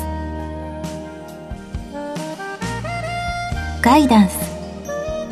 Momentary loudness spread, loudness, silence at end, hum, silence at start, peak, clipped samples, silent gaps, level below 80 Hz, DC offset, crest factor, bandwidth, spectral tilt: 18 LU; -20 LUFS; 0 s; none; 0 s; 0 dBFS; under 0.1%; none; -34 dBFS; under 0.1%; 20 dB; 14 kHz; -5.5 dB/octave